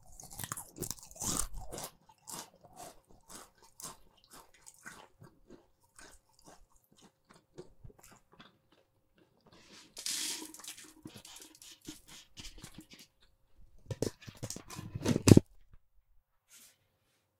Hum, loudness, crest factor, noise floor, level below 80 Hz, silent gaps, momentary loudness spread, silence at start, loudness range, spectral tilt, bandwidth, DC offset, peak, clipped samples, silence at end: none; -34 LUFS; 38 dB; -77 dBFS; -58 dBFS; none; 22 LU; 0.15 s; 26 LU; -5 dB/octave; 17 kHz; under 0.1%; -2 dBFS; under 0.1%; 1.65 s